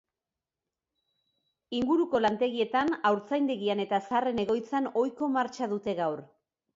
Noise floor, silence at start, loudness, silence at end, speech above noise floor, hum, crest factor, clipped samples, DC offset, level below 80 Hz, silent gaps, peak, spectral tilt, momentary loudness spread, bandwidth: under -90 dBFS; 1.7 s; -29 LUFS; 0.5 s; over 62 dB; none; 16 dB; under 0.1%; under 0.1%; -66 dBFS; none; -12 dBFS; -6 dB/octave; 6 LU; 7.8 kHz